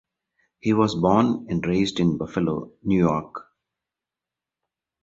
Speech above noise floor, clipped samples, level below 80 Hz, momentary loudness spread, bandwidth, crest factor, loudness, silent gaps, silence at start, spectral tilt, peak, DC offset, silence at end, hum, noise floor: 66 dB; under 0.1%; -50 dBFS; 10 LU; 7.8 kHz; 20 dB; -23 LUFS; none; 0.65 s; -7 dB/octave; -4 dBFS; under 0.1%; 1.6 s; none; -88 dBFS